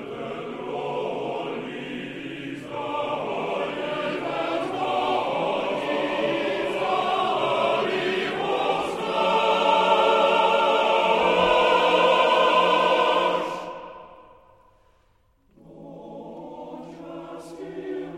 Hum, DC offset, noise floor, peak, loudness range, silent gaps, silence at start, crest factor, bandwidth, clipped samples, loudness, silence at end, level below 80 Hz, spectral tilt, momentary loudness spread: none; under 0.1%; -63 dBFS; -6 dBFS; 20 LU; none; 0 s; 18 dB; 13.5 kHz; under 0.1%; -23 LUFS; 0 s; -60 dBFS; -4.5 dB/octave; 20 LU